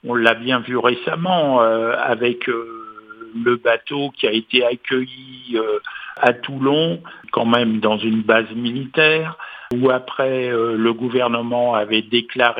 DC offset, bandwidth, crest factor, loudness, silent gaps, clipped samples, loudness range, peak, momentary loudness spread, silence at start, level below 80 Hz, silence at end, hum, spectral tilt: under 0.1%; 8 kHz; 18 dB; -18 LUFS; none; under 0.1%; 2 LU; 0 dBFS; 10 LU; 0.05 s; -64 dBFS; 0 s; none; -7 dB/octave